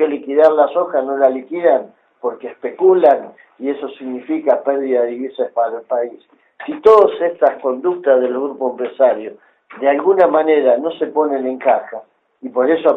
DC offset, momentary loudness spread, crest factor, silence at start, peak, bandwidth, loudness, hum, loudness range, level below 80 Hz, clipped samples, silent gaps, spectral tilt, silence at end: under 0.1%; 14 LU; 16 dB; 0 s; 0 dBFS; 5.2 kHz; -16 LUFS; none; 2 LU; -64 dBFS; under 0.1%; none; -7 dB/octave; 0 s